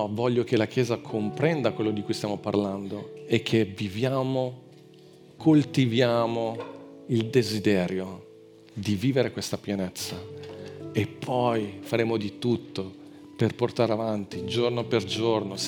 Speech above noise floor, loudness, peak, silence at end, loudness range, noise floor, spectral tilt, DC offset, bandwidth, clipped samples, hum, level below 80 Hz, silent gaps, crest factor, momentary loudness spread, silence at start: 25 dB; -27 LUFS; -6 dBFS; 0 s; 4 LU; -51 dBFS; -6 dB/octave; under 0.1%; 19.5 kHz; under 0.1%; none; -70 dBFS; none; 20 dB; 14 LU; 0 s